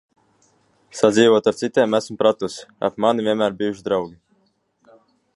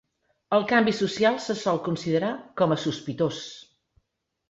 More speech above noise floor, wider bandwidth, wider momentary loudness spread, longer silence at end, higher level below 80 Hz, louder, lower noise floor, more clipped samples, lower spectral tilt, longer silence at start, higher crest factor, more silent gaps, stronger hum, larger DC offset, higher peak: about the same, 46 dB vs 49 dB; first, 11.5 kHz vs 8 kHz; first, 12 LU vs 9 LU; first, 1.25 s vs 0.85 s; about the same, -62 dBFS vs -64 dBFS; first, -19 LUFS vs -25 LUFS; second, -65 dBFS vs -74 dBFS; neither; about the same, -5 dB/octave vs -5.5 dB/octave; first, 0.95 s vs 0.5 s; about the same, 20 dB vs 18 dB; neither; neither; neither; first, -2 dBFS vs -8 dBFS